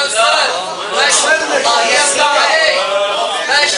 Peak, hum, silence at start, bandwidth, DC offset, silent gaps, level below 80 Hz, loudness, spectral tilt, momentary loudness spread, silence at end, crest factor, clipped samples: 0 dBFS; none; 0 s; 11 kHz; under 0.1%; none; -58 dBFS; -11 LUFS; 1 dB/octave; 5 LU; 0 s; 12 dB; under 0.1%